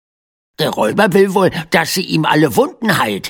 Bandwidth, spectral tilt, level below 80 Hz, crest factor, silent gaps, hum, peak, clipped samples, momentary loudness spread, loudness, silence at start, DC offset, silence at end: 17.5 kHz; -5 dB/octave; -52 dBFS; 14 dB; none; none; 0 dBFS; under 0.1%; 4 LU; -14 LUFS; 0.6 s; under 0.1%; 0 s